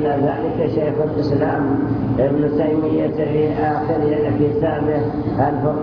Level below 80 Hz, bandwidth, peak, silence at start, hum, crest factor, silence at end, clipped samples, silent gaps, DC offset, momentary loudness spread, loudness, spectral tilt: -40 dBFS; 5.4 kHz; -4 dBFS; 0 s; none; 14 dB; 0 s; under 0.1%; none; under 0.1%; 2 LU; -19 LUFS; -10.5 dB/octave